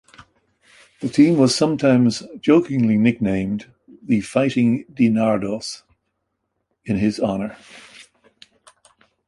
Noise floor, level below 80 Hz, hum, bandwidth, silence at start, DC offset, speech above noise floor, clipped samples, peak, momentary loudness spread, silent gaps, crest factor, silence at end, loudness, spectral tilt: -75 dBFS; -54 dBFS; none; 11.5 kHz; 1 s; under 0.1%; 56 dB; under 0.1%; -2 dBFS; 13 LU; none; 18 dB; 1.25 s; -19 LUFS; -6 dB/octave